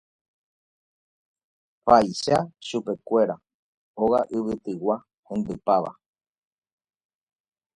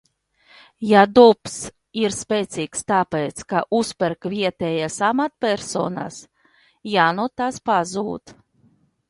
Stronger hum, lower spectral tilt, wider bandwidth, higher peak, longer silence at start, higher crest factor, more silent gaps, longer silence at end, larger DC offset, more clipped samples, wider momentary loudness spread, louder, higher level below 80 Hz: neither; about the same, -5.5 dB/octave vs -4.5 dB/octave; about the same, 11.5 kHz vs 11.5 kHz; about the same, -2 dBFS vs 0 dBFS; first, 1.85 s vs 0.8 s; about the same, 24 dB vs 20 dB; first, 3.54-3.94 s, 5.14-5.23 s vs none; first, 1.85 s vs 0.75 s; neither; neither; second, 12 LU vs 16 LU; second, -24 LUFS vs -20 LUFS; about the same, -60 dBFS vs -58 dBFS